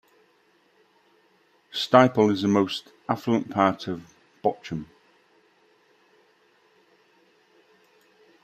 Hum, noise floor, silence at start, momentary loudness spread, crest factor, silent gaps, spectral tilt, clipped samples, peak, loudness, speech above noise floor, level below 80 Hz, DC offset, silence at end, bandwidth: none; -63 dBFS; 1.75 s; 17 LU; 24 dB; none; -6 dB/octave; under 0.1%; -2 dBFS; -24 LUFS; 41 dB; -68 dBFS; under 0.1%; 3.6 s; 15 kHz